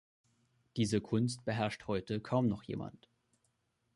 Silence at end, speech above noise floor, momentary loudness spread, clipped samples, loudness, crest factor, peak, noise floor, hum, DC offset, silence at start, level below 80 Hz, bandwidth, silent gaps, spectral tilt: 1.05 s; 44 dB; 10 LU; under 0.1%; -36 LUFS; 20 dB; -18 dBFS; -79 dBFS; none; under 0.1%; 0.75 s; -64 dBFS; 11.5 kHz; none; -6.5 dB/octave